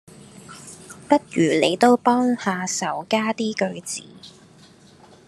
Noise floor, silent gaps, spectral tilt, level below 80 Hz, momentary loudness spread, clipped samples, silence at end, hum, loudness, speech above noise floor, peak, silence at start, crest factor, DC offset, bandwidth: -50 dBFS; none; -4 dB/octave; -70 dBFS; 23 LU; under 0.1%; 1 s; none; -21 LUFS; 29 dB; -2 dBFS; 0.35 s; 20 dB; under 0.1%; 13 kHz